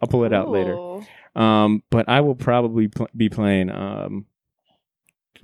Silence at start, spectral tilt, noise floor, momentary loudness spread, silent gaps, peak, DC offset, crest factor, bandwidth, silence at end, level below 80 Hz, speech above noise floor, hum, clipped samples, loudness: 0 s; -8 dB/octave; -70 dBFS; 14 LU; none; -2 dBFS; under 0.1%; 18 dB; 11 kHz; 1.2 s; -52 dBFS; 50 dB; none; under 0.1%; -20 LUFS